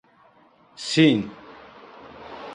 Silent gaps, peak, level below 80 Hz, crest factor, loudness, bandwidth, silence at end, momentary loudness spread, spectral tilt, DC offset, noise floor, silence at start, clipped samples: none; -4 dBFS; -64 dBFS; 20 dB; -21 LUFS; 10.5 kHz; 0 s; 27 LU; -5 dB/octave; under 0.1%; -56 dBFS; 0.8 s; under 0.1%